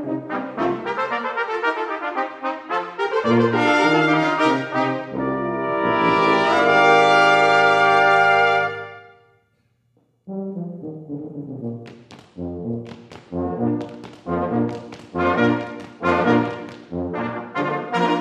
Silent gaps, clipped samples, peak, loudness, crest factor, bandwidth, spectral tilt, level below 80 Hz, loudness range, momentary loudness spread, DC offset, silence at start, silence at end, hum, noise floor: none; under 0.1%; -2 dBFS; -19 LUFS; 18 dB; 11 kHz; -5.5 dB/octave; -58 dBFS; 17 LU; 18 LU; under 0.1%; 0 s; 0 s; none; -65 dBFS